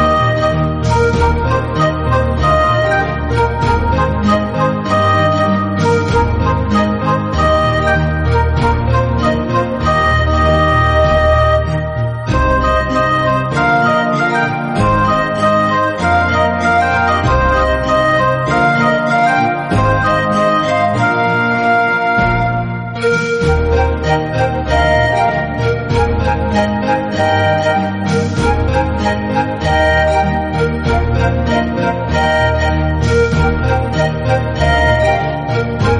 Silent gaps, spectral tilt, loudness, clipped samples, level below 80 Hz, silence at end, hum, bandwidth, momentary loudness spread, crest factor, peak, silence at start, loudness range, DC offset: none; -6.5 dB/octave; -13 LUFS; under 0.1%; -22 dBFS; 0 s; none; 10.5 kHz; 4 LU; 12 dB; -2 dBFS; 0 s; 2 LU; under 0.1%